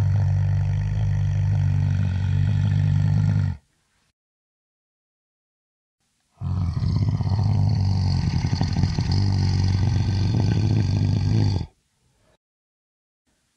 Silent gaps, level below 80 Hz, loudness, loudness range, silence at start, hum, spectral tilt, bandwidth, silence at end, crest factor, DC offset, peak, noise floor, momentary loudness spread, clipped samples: 4.13-5.98 s; -36 dBFS; -22 LUFS; 8 LU; 0 s; none; -7.5 dB/octave; 7 kHz; 1.9 s; 16 dB; under 0.1%; -6 dBFS; -67 dBFS; 4 LU; under 0.1%